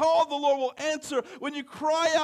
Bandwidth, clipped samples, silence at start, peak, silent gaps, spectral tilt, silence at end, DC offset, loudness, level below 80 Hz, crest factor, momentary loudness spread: 13 kHz; under 0.1%; 0 s; -12 dBFS; none; -2 dB/octave; 0 s; under 0.1%; -27 LUFS; -70 dBFS; 14 dB; 11 LU